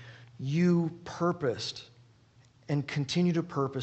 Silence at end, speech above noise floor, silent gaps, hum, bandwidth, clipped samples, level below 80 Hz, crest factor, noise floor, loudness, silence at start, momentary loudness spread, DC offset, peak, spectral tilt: 0 s; 32 dB; none; none; 8.4 kHz; under 0.1%; -68 dBFS; 16 dB; -61 dBFS; -30 LUFS; 0 s; 11 LU; under 0.1%; -16 dBFS; -6.5 dB/octave